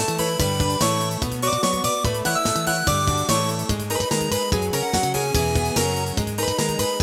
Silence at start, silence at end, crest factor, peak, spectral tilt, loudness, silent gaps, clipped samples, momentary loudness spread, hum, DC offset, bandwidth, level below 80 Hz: 0 s; 0 s; 16 dB; -6 dBFS; -4 dB/octave; -22 LUFS; none; under 0.1%; 3 LU; none; under 0.1%; 17 kHz; -36 dBFS